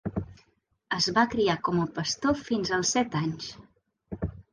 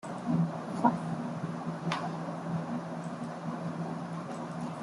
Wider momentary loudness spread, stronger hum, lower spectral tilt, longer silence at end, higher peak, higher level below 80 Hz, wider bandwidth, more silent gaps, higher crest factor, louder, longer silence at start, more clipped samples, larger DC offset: first, 14 LU vs 9 LU; neither; second, -4 dB/octave vs -7 dB/octave; about the same, 0.1 s vs 0 s; about the same, -10 dBFS vs -10 dBFS; first, -50 dBFS vs -70 dBFS; about the same, 10.5 kHz vs 11.5 kHz; neither; about the same, 20 dB vs 24 dB; first, -27 LUFS vs -35 LUFS; about the same, 0.05 s vs 0.05 s; neither; neither